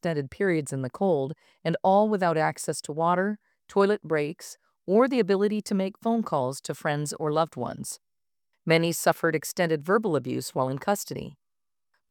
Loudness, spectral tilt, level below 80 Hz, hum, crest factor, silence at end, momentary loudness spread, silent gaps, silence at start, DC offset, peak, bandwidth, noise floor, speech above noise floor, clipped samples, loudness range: -26 LUFS; -5.5 dB/octave; -68 dBFS; none; 20 dB; 0.8 s; 13 LU; none; 0.05 s; under 0.1%; -6 dBFS; 19 kHz; under -90 dBFS; over 64 dB; under 0.1%; 2 LU